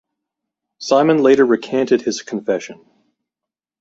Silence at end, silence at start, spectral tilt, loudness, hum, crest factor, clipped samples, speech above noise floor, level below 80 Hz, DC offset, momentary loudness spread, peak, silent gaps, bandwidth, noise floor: 1.1 s; 0.8 s; -5 dB/octave; -16 LUFS; none; 16 dB; under 0.1%; 71 dB; -64 dBFS; under 0.1%; 11 LU; -2 dBFS; none; 7.8 kHz; -86 dBFS